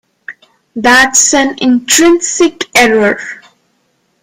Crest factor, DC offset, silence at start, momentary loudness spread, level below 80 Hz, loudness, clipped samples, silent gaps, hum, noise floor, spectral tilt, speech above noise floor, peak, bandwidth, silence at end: 12 dB; under 0.1%; 0.3 s; 9 LU; -46 dBFS; -8 LUFS; 0.2%; none; none; -59 dBFS; -1.5 dB/octave; 50 dB; 0 dBFS; over 20 kHz; 0.85 s